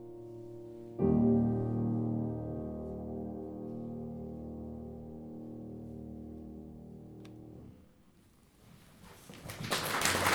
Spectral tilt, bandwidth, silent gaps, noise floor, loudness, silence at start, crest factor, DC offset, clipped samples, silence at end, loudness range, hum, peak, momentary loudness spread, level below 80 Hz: -5 dB/octave; over 20 kHz; none; -63 dBFS; -36 LUFS; 0 s; 26 dB; under 0.1%; under 0.1%; 0 s; 17 LU; none; -12 dBFS; 21 LU; -56 dBFS